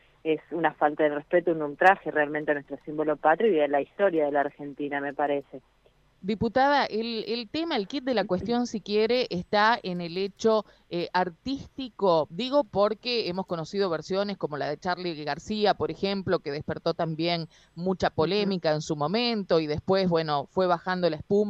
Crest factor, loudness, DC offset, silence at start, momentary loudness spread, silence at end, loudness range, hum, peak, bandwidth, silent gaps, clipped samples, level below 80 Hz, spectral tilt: 22 dB; -27 LUFS; under 0.1%; 0.25 s; 9 LU; 0 s; 4 LU; none; -6 dBFS; 8.2 kHz; none; under 0.1%; -58 dBFS; -6 dB/octave